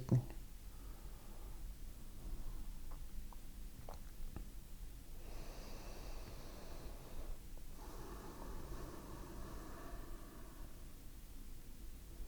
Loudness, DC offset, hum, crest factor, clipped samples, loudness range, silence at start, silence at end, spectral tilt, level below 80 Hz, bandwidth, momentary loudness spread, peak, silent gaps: -52 LUFS; under 0.1%; none; 26 dB; under 0.1%; 2 LU; 0 s; 0 s; -6 dB/octave; -50 dBFS; over 20 kHz; 4 LU; -22 dBFS; none